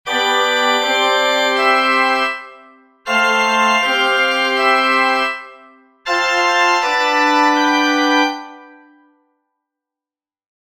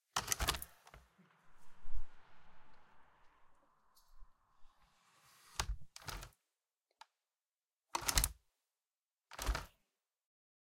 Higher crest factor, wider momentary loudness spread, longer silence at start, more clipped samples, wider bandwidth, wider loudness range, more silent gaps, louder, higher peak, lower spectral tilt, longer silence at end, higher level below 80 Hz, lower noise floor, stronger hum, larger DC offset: second, 16 dB vs 34 dB; second, 7 LU vs 23 LU; about the same, 0.05 s vs 0.15 s; neither; about the same, 16.5 kHz vs 16.5 kHz; second, 2 LU vs 20 LU; second, none vs 7.73-7.77 s; first, -14 LUFS vs -40 LUFS; first, 0 dBFS vs -8 dBFS; about the same, -1 dB/octave vs -1.5 dB/octave; first, 2.05 s vs 1.05 s; second, -62 dBFS vs -50 dBFS; about the same, under -90 dBFS vs under -90 dBFS; neither; neither